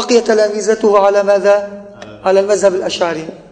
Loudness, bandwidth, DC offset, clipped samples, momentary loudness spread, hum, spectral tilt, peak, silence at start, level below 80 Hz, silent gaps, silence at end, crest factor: -13 LUFS; 9.6 kHz; under 0.1%; under 0.1%; 10 LU; none; -3.5 dB/octave; 0 dBFS; 0 s; -54 dBFS; none; 0.1 s; 12 dB